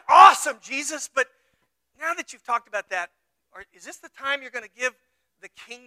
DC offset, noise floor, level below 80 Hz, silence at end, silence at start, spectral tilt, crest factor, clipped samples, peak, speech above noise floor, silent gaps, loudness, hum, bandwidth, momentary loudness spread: under 0.1%; -72 dBFS; -74 dBFS; 0.1 s; 0.1 s; 0.5 dB/octave; 24 dB; under 0.1%; 0 dBFS; 41 dB; none; -22 LUFS; none; 15.5 kHz; 27 LU